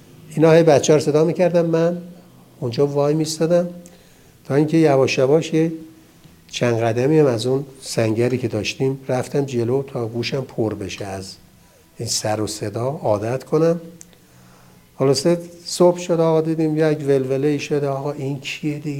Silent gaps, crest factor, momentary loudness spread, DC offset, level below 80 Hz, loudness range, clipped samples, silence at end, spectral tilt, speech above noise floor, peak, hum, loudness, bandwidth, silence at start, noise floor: none; 20 dB; 11 LU; under 0.1%; -58 dBFS; 6 LU; under 0.1%; 0 s; -6 dB/octave; 32 dB; 0 dBFS; none; -19 LUFS; 16.5 kHz; 0.25 s; -51 dBFS